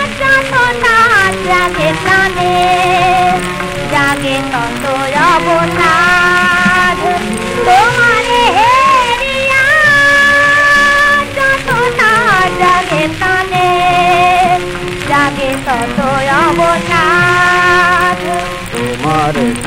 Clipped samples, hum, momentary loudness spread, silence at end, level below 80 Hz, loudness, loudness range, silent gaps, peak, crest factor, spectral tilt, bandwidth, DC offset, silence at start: under 0.1%; none; 8 LU; 0 s; -32 dBFS; -9 LUFS; 4 LU; none; 0 dBFS; 10 dB; -4 dB/octave; 16 kHz; 0.3%; 0 s